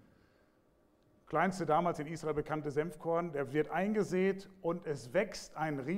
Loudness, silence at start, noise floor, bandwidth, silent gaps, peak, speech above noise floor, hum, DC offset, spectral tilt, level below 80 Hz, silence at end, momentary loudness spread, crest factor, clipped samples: -35 LUFS; 1.3 s; -70 dBFS; 15.5 kHz; none; -16 dBFS; 35 dB; none; under 0.1%; -6.5 dB/octave; -64 dBFS; 0 s; 7 LU; 20 dB; under 0.1%